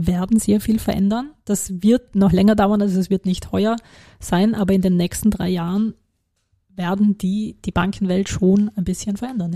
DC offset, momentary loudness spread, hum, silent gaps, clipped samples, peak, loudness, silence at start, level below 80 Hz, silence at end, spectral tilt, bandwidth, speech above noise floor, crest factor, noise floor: 0.3%; 8 LU; none; none; under 0.1%; -4 dBFS; -19 LUFS; 0 s; -40 dBFS; 0 s; -6.5 dB/octave; 15 kHz; 51 dB; 14 dB; -69 dBFS